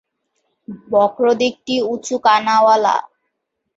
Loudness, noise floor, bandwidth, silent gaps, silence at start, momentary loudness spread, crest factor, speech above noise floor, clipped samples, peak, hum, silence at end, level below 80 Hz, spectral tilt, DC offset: -16 LUFS; -75 dBFS; 8 kHz; none; 0.7 s; 9 LU; 16 dB; 59 dB; under 0.1%; -2 dBFS; none; 0.7 s; -64 dBFS; -3.5 dB/octave; under 0.1%